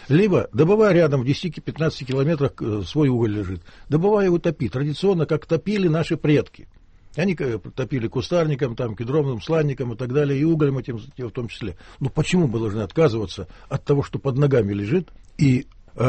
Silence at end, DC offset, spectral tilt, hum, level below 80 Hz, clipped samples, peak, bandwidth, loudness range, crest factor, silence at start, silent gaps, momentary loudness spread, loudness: 0 s; under 0.1%; -7.5 dB/octave; none; -46 dBFS; under 0.1%; -6 dBFS; 8.4 kHz; 3 LU; 16 dB; 0 s; none; 12 LU; -22 LUFS